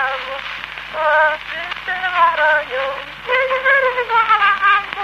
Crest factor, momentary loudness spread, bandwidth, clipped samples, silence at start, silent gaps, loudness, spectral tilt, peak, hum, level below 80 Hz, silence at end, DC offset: 14 dB; 12 LU; 14.5 kHz; under 0.1%; 0 s; none; -16 LUFS; -2.5 dB/octave; -2 dBFS; none; -50 dBFS; 0 s; under 0.1%